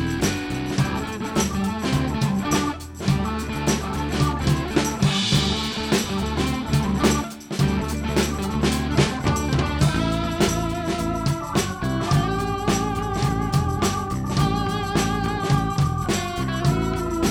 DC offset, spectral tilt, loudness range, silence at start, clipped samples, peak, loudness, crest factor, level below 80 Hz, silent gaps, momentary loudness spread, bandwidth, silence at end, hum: under 0.1%; -5 dB/octave; 1 LU; 0 s; under 0.1%; -4 dBFS; -23 LUFS; 18 dB; -34 dBFS; none; 4 LU; over 20 kHz; 0 s; none